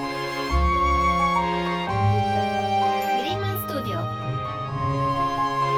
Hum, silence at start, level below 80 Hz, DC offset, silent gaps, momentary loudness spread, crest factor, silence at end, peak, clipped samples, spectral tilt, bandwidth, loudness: none; 0 s; -34 dBFS; under 0.1%; none; 8 LU; 14 dB; 0 s; -10 dBFS; under 0.1%; -6 dB/octave; 19 kHz; -24 LUFS